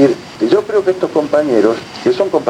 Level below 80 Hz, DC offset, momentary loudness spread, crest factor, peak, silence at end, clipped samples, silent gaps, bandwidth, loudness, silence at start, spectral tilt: -56 dBFS; under 0.1%; 4 LU; 14 dB; 0 dBFS; 0 s; under 0.1%; none; 11 kHz; -14 LUFS; 0 s; -6 dB/octave